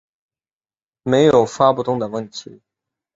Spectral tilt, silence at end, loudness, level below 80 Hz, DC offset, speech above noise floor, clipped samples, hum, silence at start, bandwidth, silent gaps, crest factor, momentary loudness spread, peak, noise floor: -6 dB/octave; 0.75 s; -16 LUFS; -56 dBFS; under 0.1%; over 73 dB; under 0.1%; none; 1.05 s; 7.8 kHz; none; 18 dB; 18 LU; -2 dBFS; under -90 dBFS